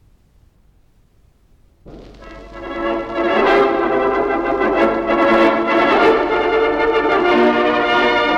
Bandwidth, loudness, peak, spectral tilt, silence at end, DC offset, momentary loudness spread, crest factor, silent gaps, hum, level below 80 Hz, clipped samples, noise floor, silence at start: 8.2 kHz; -15 LUFS; -6 dBFS; -5.5 dB/octave; 0 s; under 0.1%; 8 LU; 12 dB; none; none; -42 dBFS; under 0.1%; -53 dBFS; 1.85 s